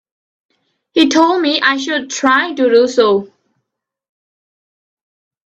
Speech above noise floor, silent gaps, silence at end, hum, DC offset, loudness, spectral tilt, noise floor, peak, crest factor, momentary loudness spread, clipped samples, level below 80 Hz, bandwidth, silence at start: 63 dB; none; 2.2 s; none; under 0.1%; -13 LUFS; -3 dB/octave; -76 dBFS; 0 dBFS; 16 dB; 7 LU; under 0.1%; -62 dBFS; 8.4 kHz; 0.95 s